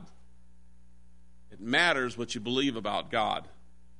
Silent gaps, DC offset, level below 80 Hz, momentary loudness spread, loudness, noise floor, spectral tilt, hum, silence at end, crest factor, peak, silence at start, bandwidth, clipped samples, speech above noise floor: none; 0.5%; -60 dBFS; 11 LU; -29 LUFS; -60 dBFS; -3.5 dB/octave; none; 0.5 s; 22 dB; -10 dBFS; 0 s; 10.5 kHz; under 0.1%; 30 dB